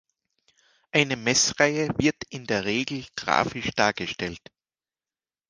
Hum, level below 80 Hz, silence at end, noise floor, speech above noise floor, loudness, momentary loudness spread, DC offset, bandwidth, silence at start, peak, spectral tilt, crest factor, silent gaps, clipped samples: none; -56 dBFS; 1.1 s; under -90 dBFS; over 65 dB; -24 LUFS; 11 LU; under 0.1%; 10.5 kHz; 0.95 s; -2 dBFS; -3 dB/octave; 26 dB; none; under 0.1%